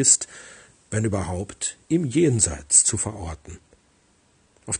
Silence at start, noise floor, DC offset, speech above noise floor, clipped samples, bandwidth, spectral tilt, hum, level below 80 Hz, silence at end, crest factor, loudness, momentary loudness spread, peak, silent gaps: 0 s; -61 dBFS; under 0.1%; 38 dB; under 0.1%; 10.5 kHz; -3.5 dB/octave; none; -48 dBFS; 0 s; 22 dB; -21 LUFS; 19 LU; -2 dBFS; none